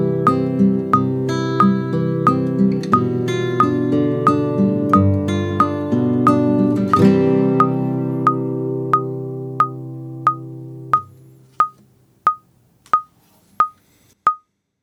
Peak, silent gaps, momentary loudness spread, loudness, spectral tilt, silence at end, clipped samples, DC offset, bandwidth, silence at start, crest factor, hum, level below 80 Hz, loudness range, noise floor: 0 dBFS; none; 6 LU; -18 LUFS; -8.5 dB/octave; 0.45 s; under 0.1%; under 0.1%; 11.5 kHz; 0 s; 16 dB; none; -58 dBFS; 7 LU; -56 dBFS